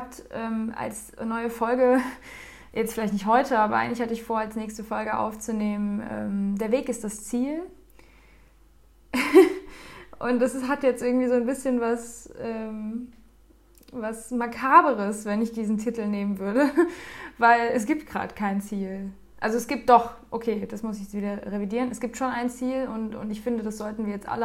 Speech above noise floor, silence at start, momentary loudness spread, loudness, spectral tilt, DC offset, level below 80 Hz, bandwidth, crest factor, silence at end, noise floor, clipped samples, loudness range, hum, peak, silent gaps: 30 dB; 0 s; 15 LU; -26 LUFS; -5.5 dB/octave; under 0.1%; -56 dBFS; 16 kHz; 22 dB; 0 s; -55 dBFS; under 0.1%; 6 LU; none; -4 dBFS; none